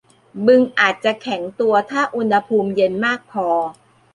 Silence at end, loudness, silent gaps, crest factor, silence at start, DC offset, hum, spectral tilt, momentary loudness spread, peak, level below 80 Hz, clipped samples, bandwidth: 0.4 s; -18 LUFS; none; 16 dB; 0.35 s; under 0.1%; none; -5.5 dB/octave; 9 LU; -2 dBFS; -64 dBFS; under 0.1%; 10.5 kHz